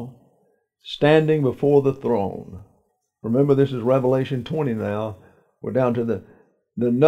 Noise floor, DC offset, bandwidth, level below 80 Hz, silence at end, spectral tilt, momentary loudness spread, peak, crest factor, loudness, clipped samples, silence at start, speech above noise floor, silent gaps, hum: -67 dBFS; under 0.1%; 9.2 kHz; -60 dBFS; 0 s; -8.5 dB/octave; 17 LU; -4 dBFS; 18 dB; -21 LUFS; under 0.1%; 0 s; 47 dB; none; none